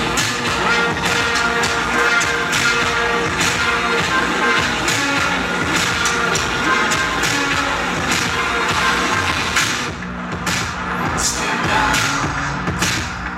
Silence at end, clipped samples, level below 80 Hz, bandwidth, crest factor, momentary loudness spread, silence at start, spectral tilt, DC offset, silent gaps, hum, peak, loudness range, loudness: 0 s; under 0.1%; -36 dBFS; 16.5 kHz; 16 dB; 5 LU; 0 s; -2.5 dB/octave; under 0.1%; none; none; -2 dBFS; 2 LU; -17 LUFS